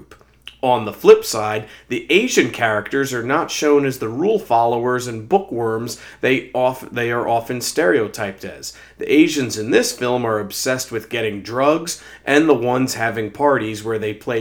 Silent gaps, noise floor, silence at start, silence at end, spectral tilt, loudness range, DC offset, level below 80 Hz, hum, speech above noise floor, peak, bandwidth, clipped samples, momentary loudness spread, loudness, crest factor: none; -43 dBFS; 0 s; 0 s; -4 dB/octave; 3 LU; under 0.1%; -56 dBFS; none; 25 dB; 0 dBFS; over 20 kHz; under 0.1%; 10 LU; -18 LUFS; 18 dB